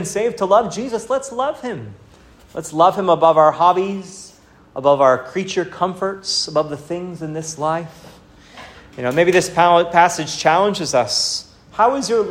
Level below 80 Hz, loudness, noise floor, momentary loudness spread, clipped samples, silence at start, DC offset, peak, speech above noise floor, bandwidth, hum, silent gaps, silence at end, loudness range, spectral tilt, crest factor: -54 dBFS; -17 LUFS; -47 dBFS; 16 LU; under 0.1%; 0 s; under 0.1%; 0 dBFS; 30 dB; 16 kHz; none; none; 0 s; 6 LU; -4 dB/octave; 18 dB